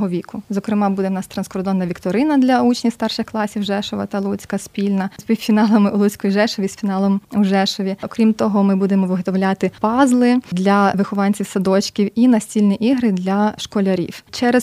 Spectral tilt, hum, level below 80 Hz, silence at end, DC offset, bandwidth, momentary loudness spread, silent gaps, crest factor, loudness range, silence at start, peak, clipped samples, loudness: -6 dB/octave; none; -56 dBFS; 0 s; under 0.1%; 15 kHz; 8 LU; none; 16 dB; 3 LU; 0 s; -2 dBFS; under 0.1%; -18 LUFS